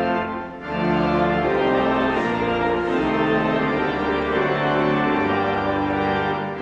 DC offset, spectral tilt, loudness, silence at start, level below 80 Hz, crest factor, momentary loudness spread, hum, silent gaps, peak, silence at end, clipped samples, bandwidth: under 0.1%; -7.5 dB/octave; -21 LUFS; 0 s; -44 dBFS; 14 dB; 3 LU; none; none; -8 dBFS; 0 s; under 0.1%; 8.4 kHz